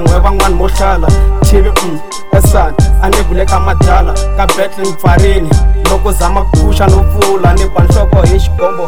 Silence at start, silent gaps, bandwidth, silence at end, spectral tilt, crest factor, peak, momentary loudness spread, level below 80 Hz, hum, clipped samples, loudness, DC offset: 0 s; none; 16.5 kHz; 0 s; -6 dB/octave; 10 dB; 0 dBFS; 4 LU; -10 dBFS; none; 4%; -10 LUFS; 20%